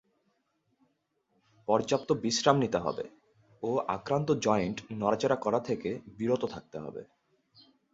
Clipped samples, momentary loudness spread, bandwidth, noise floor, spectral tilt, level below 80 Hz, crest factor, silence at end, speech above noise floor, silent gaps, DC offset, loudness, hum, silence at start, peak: under 0.1%; 15 LU; 8 kHz; -76 dBFS; -5 dB/octave; -64 dBFS; 24 dB; 0.9 s; 46 dB; none; under 0.1%; -30 LUFS; none; 1.7 s; -6 dBFS